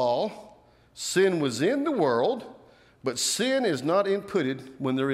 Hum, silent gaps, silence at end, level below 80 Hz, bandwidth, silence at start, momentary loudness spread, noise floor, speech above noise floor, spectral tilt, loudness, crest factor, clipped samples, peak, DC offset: none; none; 0 s; -70 dBFS; 15.5 kHz; 0 s; 11 LU; -55 dBFS; 29 dB; -4 dB/octave; -26 LUFS; 14 dB; under 0.1%; -12 dBFS; under 0.1%